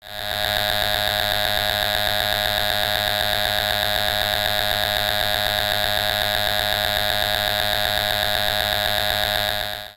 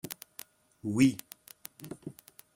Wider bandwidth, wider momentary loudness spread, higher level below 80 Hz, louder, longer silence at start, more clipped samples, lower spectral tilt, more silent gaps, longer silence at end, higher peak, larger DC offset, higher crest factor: about the same, 17 kHz vs 17 kHz; second, 0 LU vs 24 LU; first, -40 dBFS vs -68 dBFS; first, -20 LUFS vs -30 LUFS; about the same, 0.05 s vs 0.05 s; neither; second, -2 dB/octave vs -5.5 dB/octave; neither; second, 0.05 s vs 0.45 s; first, -2 dBFS vs -12 dBFS; neither; about the same, 20 dB vs 24 dB